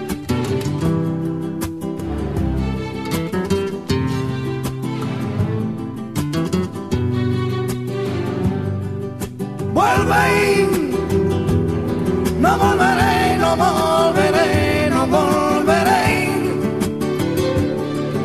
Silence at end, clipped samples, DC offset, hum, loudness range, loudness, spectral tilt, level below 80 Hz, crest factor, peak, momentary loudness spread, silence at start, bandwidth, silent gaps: 0 s; under 0.1%; 0.4%; none; 7 LU; -19 LUFS; -6 dB/octave; -38 dBFS; 16 dB; -2 dBFS; 10 LU; 0 s; 14 kHz; none